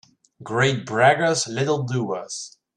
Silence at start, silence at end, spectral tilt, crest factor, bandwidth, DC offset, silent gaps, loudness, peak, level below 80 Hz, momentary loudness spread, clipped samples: 0.4 s; 0.3 s; -4.5 dB/octave; 18 dB; 11.5 kHz; under 0.1%; none; -21 LUFS; -4 dBFS; -62 dBFS; 12 LU; under 0.1%